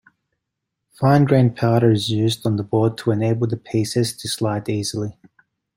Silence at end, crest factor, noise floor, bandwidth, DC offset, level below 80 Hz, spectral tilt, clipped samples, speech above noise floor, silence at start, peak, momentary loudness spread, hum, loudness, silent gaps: 0.65 s; 18 dB; -80 dBFS; 16.5 kHz; under 0.1%; -56 dBFS; -6.5 dB/octave; under 0.1%; 61 dB; 1 s; -2 dBFS; 7 LU; none; -19 LUFS; none